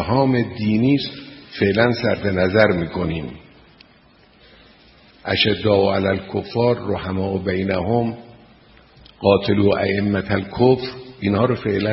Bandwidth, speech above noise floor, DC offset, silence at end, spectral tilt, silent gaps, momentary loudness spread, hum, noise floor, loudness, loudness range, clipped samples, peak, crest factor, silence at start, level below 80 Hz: 5.8 kHz; 33 dB; under 0.1%; 0 s; -10 dB/octave; none; 9 LU; none; -52 dBFS; -19 LUFS; 4 LU; under 0.1%; 0 dBFS; 20 dB; 0 s; -46 dBFS